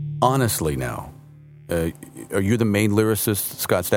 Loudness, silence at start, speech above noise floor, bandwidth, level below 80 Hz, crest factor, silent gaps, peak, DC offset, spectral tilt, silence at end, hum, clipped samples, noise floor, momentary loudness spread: -22 LUFS; 0 s; 24 dB; 19.5 kHz; -46 dBFS; 20 dB; none; -2 dBFS; under 0.1%; -5 dB/octave; 0 s; none; under 0.1%; -45 dBFS; 11 LU